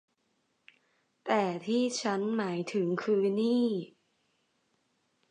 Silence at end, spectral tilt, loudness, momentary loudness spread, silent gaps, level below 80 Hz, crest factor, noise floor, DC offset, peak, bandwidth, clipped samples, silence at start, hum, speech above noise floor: 1.45 s; -5.5 dB/octave; -30 LUFS; 5 LU; none; -84 dBFS; 18 dB; -76 dBFS; under 0.1%; -14 dBFS; 10 kHz; under 0.1%; 1.25 s; none; 47 dB